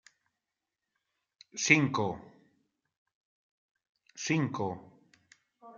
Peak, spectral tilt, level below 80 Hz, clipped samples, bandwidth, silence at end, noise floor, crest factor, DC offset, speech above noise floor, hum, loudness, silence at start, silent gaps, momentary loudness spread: -6 dBFS; -4 dB/octave; -76 dBFS; under 0.1%; 9.2 kHz; 0 s; -88 dBFS; 30 dB; under 0.1%; 59 dB; none; -29 LUFS; 1.55 s; 2.97-3.06 s, 3.15-3.75 s, 3.89-3.95 s; 21 LU